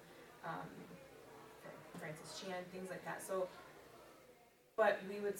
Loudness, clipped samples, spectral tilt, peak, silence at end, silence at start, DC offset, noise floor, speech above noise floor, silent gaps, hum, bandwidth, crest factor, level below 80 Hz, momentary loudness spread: -43 LUFS; under 0.1%; -4.5 dB/octave; -22 dBFS; 0 s; 0 s; under 0.1%; -67 dBFS; 26 dB; none; none; 19 kHz; 24 dB; -80 dBFS; 23 LU